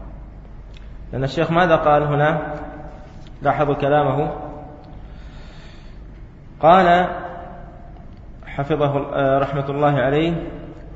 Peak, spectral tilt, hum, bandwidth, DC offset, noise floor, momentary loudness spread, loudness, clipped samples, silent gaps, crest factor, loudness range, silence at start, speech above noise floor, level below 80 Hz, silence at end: 0 dBFS; -8 dB/octave; none; 7.8 kHz; under 0.1%; -39 dBFS; 25 LU; -18 LUFS; under 0.1%; none; 20 dB; 4 LU; 0 s; 21 dB; -38 dBFS; 0 s